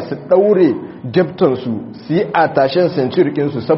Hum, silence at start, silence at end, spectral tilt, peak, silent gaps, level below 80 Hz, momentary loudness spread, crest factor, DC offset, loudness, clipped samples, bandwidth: none; 0 s; 0 s; -6 dB/octave; 0 dBFS; none; -56 dBFS; 8 LU; 14 dB; under 0.1%; -15 LUFS; under 0.1%; 5.8 kHz